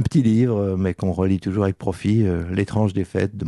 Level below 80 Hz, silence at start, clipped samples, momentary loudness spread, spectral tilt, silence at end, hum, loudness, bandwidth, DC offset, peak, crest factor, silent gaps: -44 dBFS; 0 s; under 0.1%; 5 LU; -8.5 dB/octave; 0 s; none; -21 LUFS; 11 kHz; under 0.1%; -6 dBFS; 14 dB; none